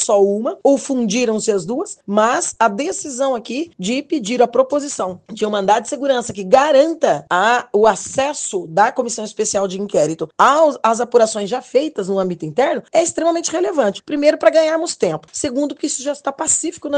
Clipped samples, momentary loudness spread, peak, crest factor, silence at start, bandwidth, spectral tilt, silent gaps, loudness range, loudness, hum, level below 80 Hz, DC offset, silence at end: under 0.1%; 8 LU; 0 dBFS; 16 dB; 0 s; 10 kHz; -3.5 dB/octave; none; 3 LU; -17 LUFS; none; -60 dBFS; under 0.1%; 0 s